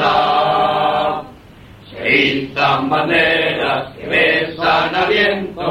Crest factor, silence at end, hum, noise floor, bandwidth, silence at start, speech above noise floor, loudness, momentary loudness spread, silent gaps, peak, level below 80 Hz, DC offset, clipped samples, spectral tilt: 14 dB; 0 s; none; -40 dBFS; 15.5 kHz; 0 s; 24 dB; -15 LUFS; 7 LU; none; -2 dBFS; -46 dBFS; under 0.1%; under 0.1%; -5.5 dB/octave